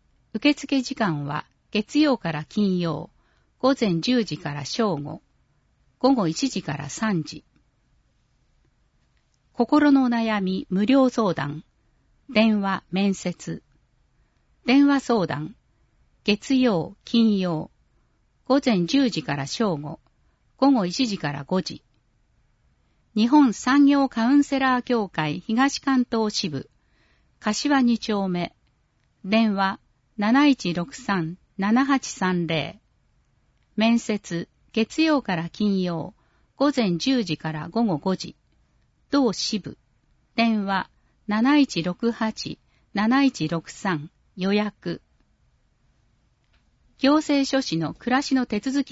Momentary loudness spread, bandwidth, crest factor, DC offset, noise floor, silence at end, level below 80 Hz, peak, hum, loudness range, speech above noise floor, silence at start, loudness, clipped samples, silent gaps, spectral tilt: 14 LU; 8 kHz; 18 dB; under 0.1%; -66 dBFS; 0 s; -60 dBFS; -6 dBFS; none; 5 LU; 44 dB; 0.35 s; -23 LUFS; under 0.1%; none; -5.5 dB/octave